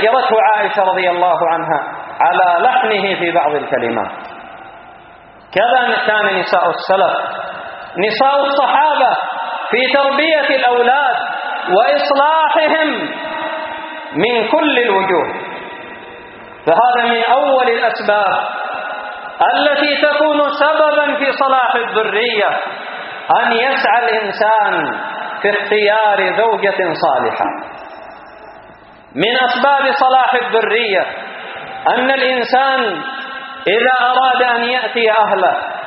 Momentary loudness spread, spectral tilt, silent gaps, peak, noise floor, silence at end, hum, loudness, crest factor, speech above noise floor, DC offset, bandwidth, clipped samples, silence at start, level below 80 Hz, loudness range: 13 LU; -0.5 dB/octave; none; 0 dBFS; -40 dBFS; 0 s; none; -14 LUFS; 14 dB; 27 dB; under 0.1%; 5.8 kHz; under 0.1%; 0 s; -62 dBFS; 3 LU